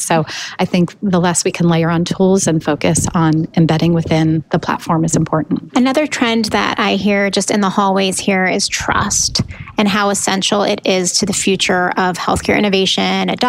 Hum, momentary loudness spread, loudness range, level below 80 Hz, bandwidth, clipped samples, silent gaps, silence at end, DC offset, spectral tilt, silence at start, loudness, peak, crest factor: none; 4 LU; 1 LU; -42 dBFS; 15.5 kHz; under 0.1%; none; 0 s; under 0.1%; -4 dB/octave; 0 s; -14 LUFS; -2 dBFS; 12 dB